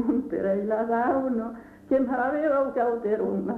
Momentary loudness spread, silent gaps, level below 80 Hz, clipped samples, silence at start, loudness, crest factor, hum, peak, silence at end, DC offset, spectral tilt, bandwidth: 5 LU; none; -58 dBFS; under 0.1%; 0 s; -26 LUFS; 12 dB; none; -12 dBFS; 0 s; under 0.1%; -9.5 dB/octave; 4.5 kHz